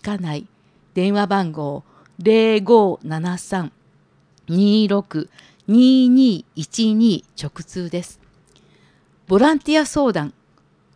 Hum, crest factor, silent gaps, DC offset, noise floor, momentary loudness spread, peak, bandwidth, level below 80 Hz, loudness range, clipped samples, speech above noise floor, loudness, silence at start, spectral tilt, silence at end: none; 18 dB; none; under 0.1%; -57 dBFS; 17 LU; -2 dBFS; 10.5 kHz; -54 dBFS; 4 LU; under 0.1%; 40 dB; -18 LUFS; 0.05 s; -6 dB/octave; 0.65 s